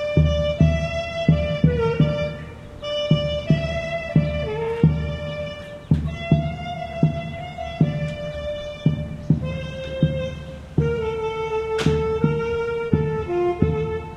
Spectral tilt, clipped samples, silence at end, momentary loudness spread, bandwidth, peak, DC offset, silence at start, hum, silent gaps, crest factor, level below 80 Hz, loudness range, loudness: -8 dB/octave; under 0.1%; 0 s; 10 LU; 8.4 kHz; -2 dBFS; under 0.1%; 0 s; none; none; 20 dB; -36 dBFS; 3 LU; -23 LUFS